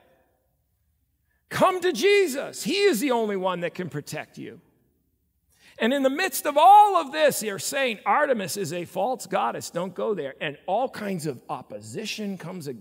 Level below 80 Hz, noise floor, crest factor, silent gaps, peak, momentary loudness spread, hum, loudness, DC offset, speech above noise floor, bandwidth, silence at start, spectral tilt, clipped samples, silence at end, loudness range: -72 dBFS; -71 dBFS; 18 dB; none; -6 dBFS; 15 LU; none; -23 LUFS; under 0.1%; 47 dB; 16.5 kHz; 1.5 s; -3.5 dB/octave; under 0.1%; 0 s; 9 LU